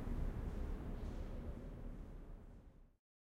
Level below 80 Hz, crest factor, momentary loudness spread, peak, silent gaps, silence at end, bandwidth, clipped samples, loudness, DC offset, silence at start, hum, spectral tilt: -48 dBFS; 16 dB; 15 LU; -30 dBFS; none; 0.45 s; 7.6 kHz; under 0.1%; -50 LUFS; under 0.1%; 0 s; none; -8 dB/octave